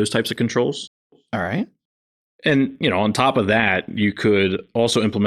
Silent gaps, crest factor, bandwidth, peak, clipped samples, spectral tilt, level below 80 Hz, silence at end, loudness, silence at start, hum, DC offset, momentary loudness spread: 0.87-1.10 s, 1.85-2.39 s; 18 dB; 13 kHz; -2 dBFS; under 0.1%; -5 dB/octave; -58 dBFS; 0 s; -20 LUFS; 0 s; none; under 0.1%; 9 LU